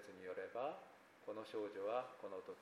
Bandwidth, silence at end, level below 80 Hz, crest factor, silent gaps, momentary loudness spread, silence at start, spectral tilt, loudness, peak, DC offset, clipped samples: 15 kHz; 0 s; under -90 dBFS; 18 dB; none; 12 LU; 0 s; -5 dB/octave; -48 LUFS; -30 dBFS; under 0.1%; under 0.1%